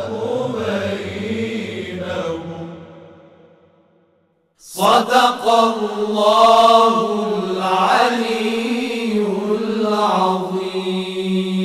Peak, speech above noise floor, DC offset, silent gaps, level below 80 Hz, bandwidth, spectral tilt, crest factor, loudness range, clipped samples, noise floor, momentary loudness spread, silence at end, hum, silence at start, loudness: 0 dBFS; 48 dB; under 0.1%; none; -60 dBFS; 15.5 kHz; -5 dB/octave; 18 dB; 13 LU; under 0.1%; -61 dBFS; 13 LU; 0 s; none; 0 s; -17 LUFS